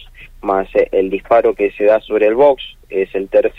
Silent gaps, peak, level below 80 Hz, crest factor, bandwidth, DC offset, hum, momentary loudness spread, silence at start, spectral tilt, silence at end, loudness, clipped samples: none; -2 dBFS; -42 dBFS; 12 dB; 5 kHz; under 0.1%; none; 9 LU; 0 s; -7 dB/octave; 0.1 s; -15 LUFS; under 0.1%